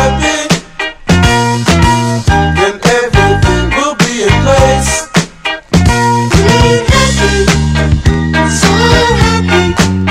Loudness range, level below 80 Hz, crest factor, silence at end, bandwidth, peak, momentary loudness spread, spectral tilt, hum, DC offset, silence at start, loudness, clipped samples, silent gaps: 1 LU; -18 dBFS; 8 dB; 0 s; 16 kHz; 0 dBFS; 4 LU; -4.5 dB/octave; none; under 0.1%; 0 s; -9 LUFS; 0.8%; none